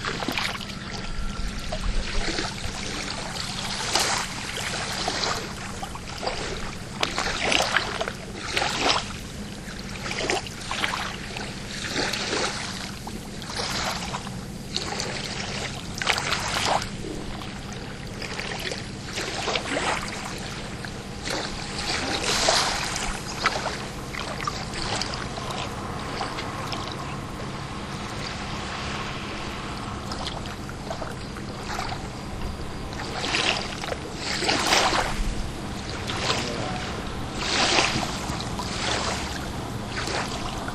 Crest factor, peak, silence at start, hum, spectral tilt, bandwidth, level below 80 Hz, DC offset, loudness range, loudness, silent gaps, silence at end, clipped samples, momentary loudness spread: 28 dB; -2 dBFS; 0 s; none; -3 dB/octave; 15.5 kHz; -38 dBFS; under 0.1%; 6 LU; -27 LUFS; none; 0 s; under 0.1%; 11 LU